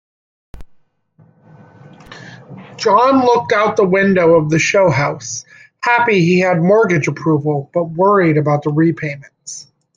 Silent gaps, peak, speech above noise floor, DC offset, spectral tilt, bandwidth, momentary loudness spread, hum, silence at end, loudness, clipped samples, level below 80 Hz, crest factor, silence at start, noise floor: none; 0 dBFS; 38 dB; under 0.1%; -6 dB/octave; 9.4 kHz; 18 LU; none; 0.35 s; -14 LUFS; under 0.1%; -50 dBFS; 14 dB; 0.55 s; -52 dBFS